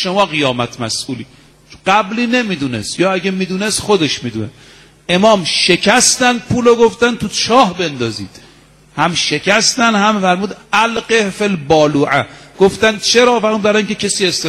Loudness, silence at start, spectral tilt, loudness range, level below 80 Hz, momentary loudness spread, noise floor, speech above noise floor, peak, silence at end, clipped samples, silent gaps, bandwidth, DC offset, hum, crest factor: -13 LUFS; 0 s; -3.5 dB/octave; 5 LU; -46 dBFS; 10 LU; -44 dBFS; 31 dB; 0 dBFS; 0 s; under 0.1%; none; 15 kHz; under 0.1%; none; 14 dB